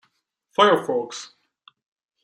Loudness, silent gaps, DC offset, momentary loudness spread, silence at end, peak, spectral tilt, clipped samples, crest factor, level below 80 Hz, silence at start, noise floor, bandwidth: -20 LUFS; none; under 0.1%; 19 LU; 1 s; -4 dBFS; -3.5 dB/octave; under 0.1%; 20 dB; -78 dBFS; 0.6 s; -71 dBFS; 14 kHz